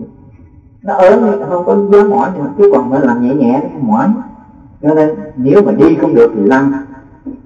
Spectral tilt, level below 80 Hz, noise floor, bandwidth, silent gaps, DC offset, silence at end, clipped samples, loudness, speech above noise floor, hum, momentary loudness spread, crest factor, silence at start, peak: -9 dB/octave; -46 dBFS; -39 dBFS; 7.4 kHz; none; under 0.1%; 0.1 s; 1%; -10 LUFS; 30 dB; none; 10 LU; 10 dB; 0 s; 0 dBFS